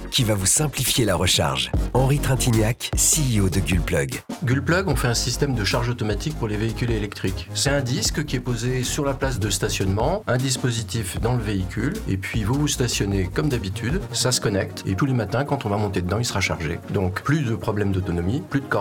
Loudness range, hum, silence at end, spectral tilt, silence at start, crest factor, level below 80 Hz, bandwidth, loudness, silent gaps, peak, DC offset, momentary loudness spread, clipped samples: 4 LU; none; 0 s; -4 dB/octave; 0 s; 14 dB; -34 dBFS; 19 kHz; -22 LUFS; none; -8 dBFS; under 0.1%; 7 LU; under 0.1%